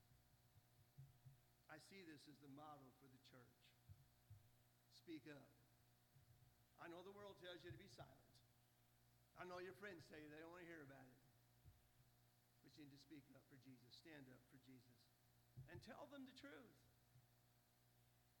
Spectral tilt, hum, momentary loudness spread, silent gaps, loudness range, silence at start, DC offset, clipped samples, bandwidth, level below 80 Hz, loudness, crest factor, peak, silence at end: -5 dB/octave; 60 Hz at -80 dBFS; 10 LU; none; 6 LU; 0 s; under 0.1%; under 0.1%; 18 kHz; -86 dBFS; -63 LUFS; 24 dB; -42 dBFS; 0 s